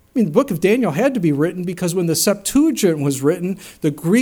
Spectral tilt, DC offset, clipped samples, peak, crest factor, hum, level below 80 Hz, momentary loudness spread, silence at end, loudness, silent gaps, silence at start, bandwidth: -5.5 dB/octave; under 0.1%; under 0.1%; 0 dBFS; 16 dB; none; -50 dBFS; 7 LU; 0 s; -18 LUFS; none; 0.15 s; 19 kHz